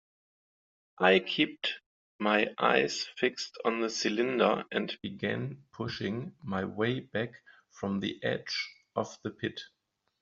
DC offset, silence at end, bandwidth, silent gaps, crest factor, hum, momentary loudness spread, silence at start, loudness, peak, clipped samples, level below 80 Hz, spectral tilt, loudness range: under 0.1%; 0.55 s; 7.8 kHz; 1.86-2.19 s; 24 dB; none; 12 LU; 1 s; -31 LUFS; -8 dBFS; under 0.1%; -72 dBFS; -3 dB/octave; 6 LU